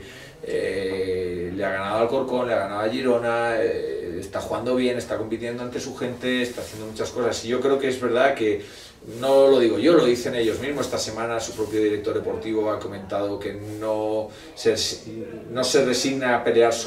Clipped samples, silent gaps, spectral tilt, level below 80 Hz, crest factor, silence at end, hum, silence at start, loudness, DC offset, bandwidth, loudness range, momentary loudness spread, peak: under 0.1%; none; -4 dB/octave; -54 dBFS; 18 dB; 0 s; none; 0 s; -23 LUFS; under 0.1%; 16 kHz; 6 LU; 12 LU; -4 dBFS